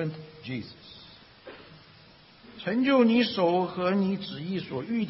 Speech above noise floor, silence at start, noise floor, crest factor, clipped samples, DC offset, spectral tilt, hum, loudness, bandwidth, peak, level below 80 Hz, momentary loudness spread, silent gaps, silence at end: 28 dB; 0 s; -54 dBFS; 18 dB; under 0.1%; under 0.1%; -10 dB/octave; none; -27 LUFS; 5.8 kHz; -10 dBFS; -66 dBFS; 25 LU; none; 0 s